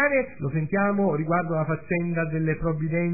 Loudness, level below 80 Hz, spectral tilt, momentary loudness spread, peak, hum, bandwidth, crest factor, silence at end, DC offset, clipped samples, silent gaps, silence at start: -25 LUFS; -48 dBFS; -15 dB/octave; 4 LU; -10 dBFS; none; 2.7 kHz; 14 dB; 0 s; 0.7%; under 0.1%; none; 0 s